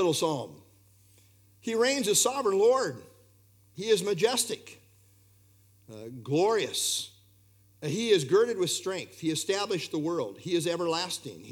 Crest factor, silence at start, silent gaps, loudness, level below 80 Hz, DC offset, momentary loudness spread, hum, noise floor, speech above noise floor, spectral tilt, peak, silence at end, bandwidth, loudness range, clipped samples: 18 dB; 0 s; none; -28 LUFS; -76 dBFS; under 0.1%; 15 LU; 60 Hz at -60 dBFS; -61 dBFS; 33 dB; -3 dB/octave; -10 dBFS; 0 s; 19 kHz; 5 LU; under 0.1%